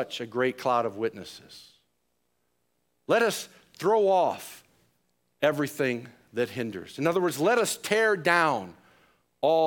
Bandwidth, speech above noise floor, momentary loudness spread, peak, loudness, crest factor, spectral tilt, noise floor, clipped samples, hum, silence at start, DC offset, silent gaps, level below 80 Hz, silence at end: 18 kHz; 50 dB; 16 LU; -6 dBFS; -26 LUFS; 22 dB; -4 dB/octave; -77 dBFS; under 0.1%; none; 0 s; under 0.1%; none; -74 dBFS; 0 s